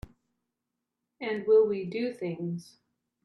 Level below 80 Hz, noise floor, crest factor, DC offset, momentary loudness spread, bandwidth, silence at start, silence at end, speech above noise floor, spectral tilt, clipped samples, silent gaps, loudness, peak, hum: -62 dBFS; -86 dBFS; 18 dB; under 0.1%; 14 LU; 10.5 kHz; 1.2 s; 0.65 s; 58 dB; -7.5 dB/octave; under 0.1%; none; -29 LUFS; -14 dBFS; none